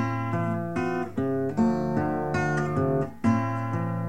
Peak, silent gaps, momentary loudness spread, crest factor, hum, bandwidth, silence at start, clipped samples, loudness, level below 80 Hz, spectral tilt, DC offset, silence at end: -12 dBFS; none; 4 LU; 14 dB; none; 9.6 kHz; 0 s; under 0.1%; -27 LUFS; -52 dBFS; -8 dB/octave; 0.6%; 0 s